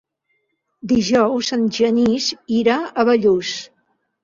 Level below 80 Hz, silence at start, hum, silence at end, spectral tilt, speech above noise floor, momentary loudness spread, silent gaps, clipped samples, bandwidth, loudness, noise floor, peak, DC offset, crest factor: -54 dBFS; 0.85 s; none; 0.55 s; -4.5 dB/octave; 53 dB; 6 LU; none; under 0.1%; 7.6 kHz; -18 LUFS; -70 dBFS; -4 dBFS; under 0.1%; 16 dB